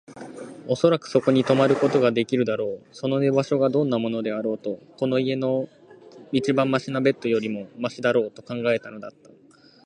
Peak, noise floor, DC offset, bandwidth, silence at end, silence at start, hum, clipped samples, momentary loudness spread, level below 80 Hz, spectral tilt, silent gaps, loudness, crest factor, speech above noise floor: -6 dBFS; -54 dBFS; under 0.1%; 10 kHz; 0.75 s; 0.1 s; none; under 0.1%; 12 LU; -68 dBFS; -6.5 dB/octave; none; -23 LUFS; 18 dB; 31 dB